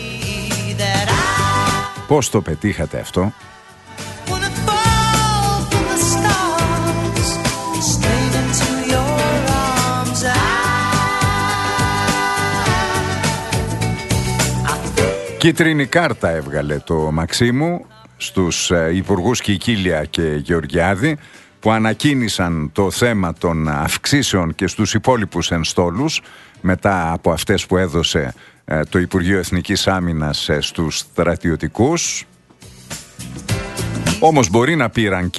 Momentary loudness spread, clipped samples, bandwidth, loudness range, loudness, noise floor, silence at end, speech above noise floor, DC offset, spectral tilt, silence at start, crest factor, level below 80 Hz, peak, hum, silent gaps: 6 LU; under 0.1%; 12.5 kHz; 2 LU; -17 LUFS; -43 dBFS; 0 s; 26 dB; under 0.1%; -4.5 dB/octave; 0 s; 18 dB; -34 dBFS; 0 dBFS; none; none